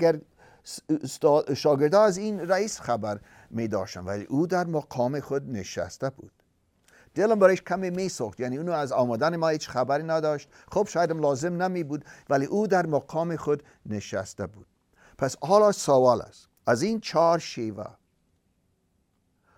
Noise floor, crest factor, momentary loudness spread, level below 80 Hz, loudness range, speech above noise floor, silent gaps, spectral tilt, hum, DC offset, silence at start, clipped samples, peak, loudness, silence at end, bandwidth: -71 dBFS; 20 dB; 14 LU; -64 dBFS; 5 LU; 45 dB; none; -5.5 dB/octave; none; under 0.1%; 0 s; under 0.1%; -6 dBFS; -26 LUFS; 1.7 s; 15.5 kHz